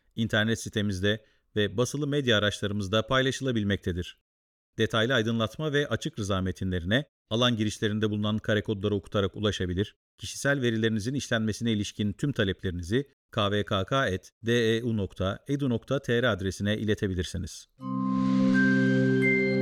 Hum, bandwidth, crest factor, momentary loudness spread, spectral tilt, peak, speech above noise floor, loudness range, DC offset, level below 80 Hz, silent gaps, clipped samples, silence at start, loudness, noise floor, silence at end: none; 15.5 kHz; 16 dB; 9 LU; -5.5 dB/octave; -10 dBFS; over 62 dB; 2 LU; under 0.1%; -52 dBFS; 4.21-4.73 s, 7.09-7.25 s, 9.96-10.18 s, 13.13-13.29 s, 14.32-14.41 s; under 0.1%; 0.15 s; -28 LUFS; under -90 dBFS; 0 s